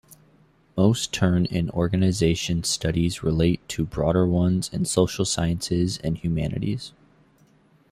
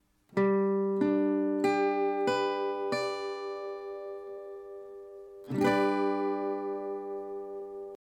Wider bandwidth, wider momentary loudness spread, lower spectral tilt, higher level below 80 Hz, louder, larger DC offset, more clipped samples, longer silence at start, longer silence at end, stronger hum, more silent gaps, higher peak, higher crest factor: first, 15 kHz vs 11 kHz; second, 6 LU vs 16 LU; about the same, -5.5 dB/octave vs -6.5 dB/octave; first, -44 dBFS vs -72 dBFS; first, -24 LUFS vs -31 LUFS; neither; neither; second, 0.1 s vs 0.3 s; first, 1.05 s vs 0.1 s; neither; neither; first, -6 dBFS vs -14 dBFS; about the same, 18 dB vs 16 dB